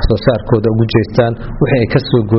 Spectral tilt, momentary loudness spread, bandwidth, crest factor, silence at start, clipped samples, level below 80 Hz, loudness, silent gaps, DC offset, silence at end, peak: -6.5 dB/octave; 2 LU; 6 kHz; 12 dB; 0 s; under 0.1%; -24 dBFS; -13 LUFS; none; under 0.1%; 0 s; 0 dBFS